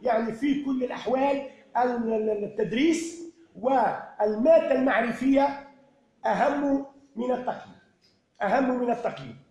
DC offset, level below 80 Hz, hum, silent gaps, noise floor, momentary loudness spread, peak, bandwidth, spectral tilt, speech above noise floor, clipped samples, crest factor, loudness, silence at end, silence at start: under 0.1%; -60 dBFS; none; none; -65 dBFS; 11 LU; -10 dBFS; 11 kHz; -5.5 dB/octave; 40 dB; under 0.1%; 16 dB; -26 LUFS; 0.15 s; 0 s